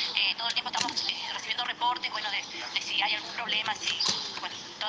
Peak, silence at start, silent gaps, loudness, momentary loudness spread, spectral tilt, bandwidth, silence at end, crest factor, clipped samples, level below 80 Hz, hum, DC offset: -10 dBFS; 0 s; none; -29 LUFS; 6 LU; 0 dB/octave; 10.5 kHz; 0 s; 22 dB; under 0.1%; -76 dBFS; none; under 0.1%